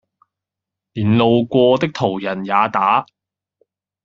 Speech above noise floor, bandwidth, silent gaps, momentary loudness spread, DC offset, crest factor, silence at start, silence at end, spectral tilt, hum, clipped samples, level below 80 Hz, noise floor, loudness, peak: 69 dB; 7.2 kHz; none; 8 LU; under 0.1%; 18 dB; 0.95 s; 1 s; -5 dB/octave; none; under 0.1%; -58 dBFS; -85 dBFS; -16 LUFS; 0 dBFS